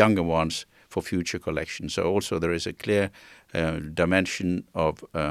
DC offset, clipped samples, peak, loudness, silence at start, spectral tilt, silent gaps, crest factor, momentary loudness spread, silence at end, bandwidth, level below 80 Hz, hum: under 0.1%; under 0.1%; -2 dBFS; -27 LUFS; 0 s; -5 dB/octave; none; 24 dB; 8 LU; 0 s; 15 kHz; -52 dBFS; none